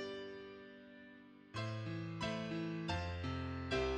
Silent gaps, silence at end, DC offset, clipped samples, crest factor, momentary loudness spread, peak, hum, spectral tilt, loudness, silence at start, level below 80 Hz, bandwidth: none; 0 s; under 0.1%; under 0.1%; 18 dB; 16 LU; -24 dBFS; none; -6 dB/octave; -43 LUFS; 0 s; -56 dBFS; 9.8 kHz